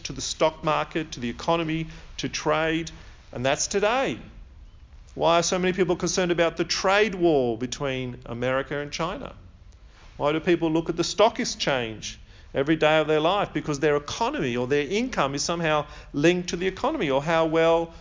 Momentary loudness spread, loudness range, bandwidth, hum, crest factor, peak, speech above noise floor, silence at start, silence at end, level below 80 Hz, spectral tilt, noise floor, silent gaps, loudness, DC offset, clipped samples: 10 LU; 4 LU; 7.6 kHz; none; 18 dB; -6 dBFS; 24 dB; 0.05 s; 0 s; -48 dBFS; -4 dB/octave; -49 dBFS; none; -24 LUFS; under 0.1%; under 0.1%